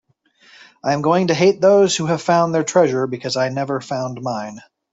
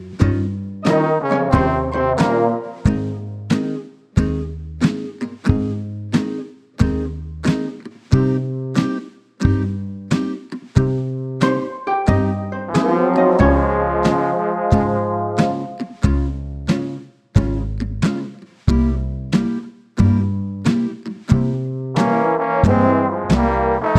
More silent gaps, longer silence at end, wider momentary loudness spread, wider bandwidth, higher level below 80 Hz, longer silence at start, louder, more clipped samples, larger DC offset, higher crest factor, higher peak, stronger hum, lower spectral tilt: neither; first, 0.35 s vs 0 s; about the same, 12 LU vs 11 LU; second, 8 kHz vs 10.5 kHz; second, -62 dBFS vs -30 dBFS; first, 0.85 s vs 0 s; about the same, -18 LUFS vs -19 LUFS; neither; neither; about the same, 16 dB vs 18 dB; about the same, -2 dBFS vs 0 dBFS; neither; second, -5 dB/octave vs -8 dB/octave